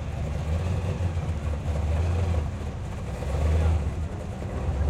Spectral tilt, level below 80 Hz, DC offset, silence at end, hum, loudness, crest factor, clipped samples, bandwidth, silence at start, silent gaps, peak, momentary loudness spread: -7.5 dB/octave; -32 dBFS; under 0.1%; 0 s; none; -29 LUFS; 12 dB; under 0.1%; 10 kHz; 0 s; none; -14 dBFS; 9 LU